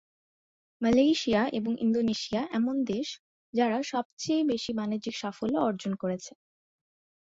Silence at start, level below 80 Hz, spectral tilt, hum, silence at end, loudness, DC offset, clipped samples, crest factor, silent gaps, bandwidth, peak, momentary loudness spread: 0.8 s; -62 dBFS; -5 dB/octave; none; 1.1 s; -29 LUFS; under 0.1%; under 0.1%; 16 dB; 3.19-3.53 s, 4.05-4.17 s; 7.8 kHz; -12 dBFS; 10 LU